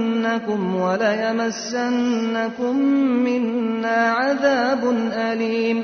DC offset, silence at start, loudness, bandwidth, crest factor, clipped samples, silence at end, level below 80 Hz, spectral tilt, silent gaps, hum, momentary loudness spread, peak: under 0.1%; 0 s; -20 LUFS; 6.6 kHz; 14 dB; under 0.1%; 0 s; -66 dBFS; -5 dB/octave; none; none; 5 LU; -6 dBFS